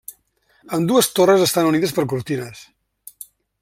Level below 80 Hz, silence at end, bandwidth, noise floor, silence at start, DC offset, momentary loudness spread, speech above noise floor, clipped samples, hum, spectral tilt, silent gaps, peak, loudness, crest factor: -60 dBFS; 1 s; 16.5 kHz; -61 dBFS; 0.1 s; under 0.1%; 24 LU; 43 dB; under 0.1%; none; -4.5 dB/octave; none; -2 dBFS; -18 LUFS; 18 dB